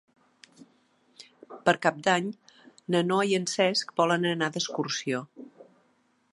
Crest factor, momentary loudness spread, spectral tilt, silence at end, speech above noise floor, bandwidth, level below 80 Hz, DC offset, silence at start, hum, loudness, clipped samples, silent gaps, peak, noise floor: 24 dB; 21 LU; -4 dB/octave; 0.7 s; 42 dB; 11.5 kHz; -78 dBFS; under 0.1%; 1.2 s; none; -27 LUFS; under 0.1%; none; -4 dBFS; -68 dBFS